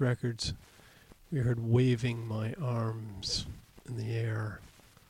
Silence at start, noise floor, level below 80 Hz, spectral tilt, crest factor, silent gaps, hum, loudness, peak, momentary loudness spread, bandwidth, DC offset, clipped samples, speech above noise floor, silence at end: 0 s; -57 dBFS; -54 dBFS; -6 dB/octave; 18 dB; none; none; -33 LUFS; -16 dBFS; 16 LU; 11.5 kHz; under 0.1%; under 0.1%; 26 dB; 0.4 s